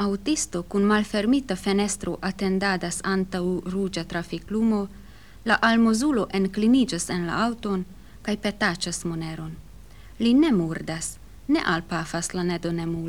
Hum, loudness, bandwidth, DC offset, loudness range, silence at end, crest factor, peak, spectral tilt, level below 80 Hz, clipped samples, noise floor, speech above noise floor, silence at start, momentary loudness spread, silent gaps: none; -24 LUFS; 15.5 kHz; 0.4%; 3 LU; 0 s; 18 dB; -6 dBFS; -4.5 dB/octave; -48 dBFS; under 0.1%; -46 dBFS; 22 dB; 0 s; 11 LU; none